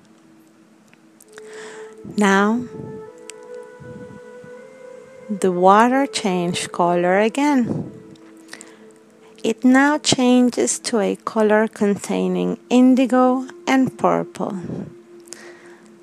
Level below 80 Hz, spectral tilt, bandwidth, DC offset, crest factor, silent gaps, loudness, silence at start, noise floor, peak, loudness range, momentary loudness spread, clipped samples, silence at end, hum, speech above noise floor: -66 dBFS; -4.5 dB/octave; 13 kHz; under 0.1%; 20 dB; none; -18 LUFS; 1.35 s; -51 dBFS; 0 dBFS; 6 LU; 24 LU; under 0.1%; 0.5 s; none; 34 dB